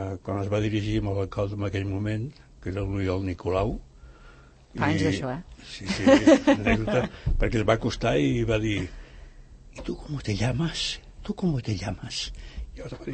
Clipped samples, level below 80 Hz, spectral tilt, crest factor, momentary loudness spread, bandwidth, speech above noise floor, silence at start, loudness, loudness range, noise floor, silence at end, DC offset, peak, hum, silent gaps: under 0.1%; -38 dBFS; -6 dB/octave; 22 dB; 16 LU; 8.8 kHz; 25 dB; 0 s; -26 LUFS; 8 LU; -51 dBFS; 0 s; under 0.1%; -4 dBFS; none; none